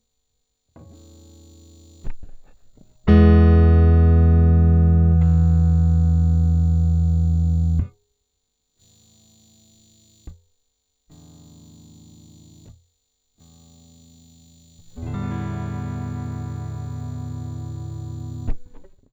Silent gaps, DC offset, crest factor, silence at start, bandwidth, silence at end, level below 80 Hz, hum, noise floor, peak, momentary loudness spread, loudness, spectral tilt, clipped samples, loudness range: none; under 0.1%; 18 dB; 2.05 s; 7.4 kHz; 0.3 s; -26 dBFS; none; -74 dBFS; -4 dBFS; 18 LU; -18 LUFS; -9.5 dB/octave; under 0.1%; 17 LU